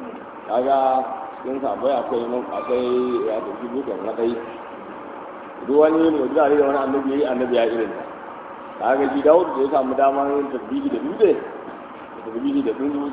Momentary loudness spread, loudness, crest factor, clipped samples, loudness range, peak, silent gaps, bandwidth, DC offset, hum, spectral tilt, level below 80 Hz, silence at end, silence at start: 18 LU; -21 LUFS; 20 dB; under 0.1%; 4 LU; -2 dBFS; none; 4 kHz; under 0.1%; none; -9.5 dB/octave; -60 dBFS; 0 s; 0 s